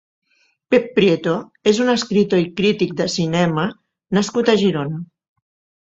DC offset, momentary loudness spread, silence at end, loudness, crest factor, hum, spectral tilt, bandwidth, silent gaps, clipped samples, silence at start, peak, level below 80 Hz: under 0.1%; 8 LU; 0.8 s; -18 LUFS; 16 dB; none; -5.5 dB/octave; 8 kHz; none; under 0.1%; 0.7 s; -2 dBFS; -56 dBFS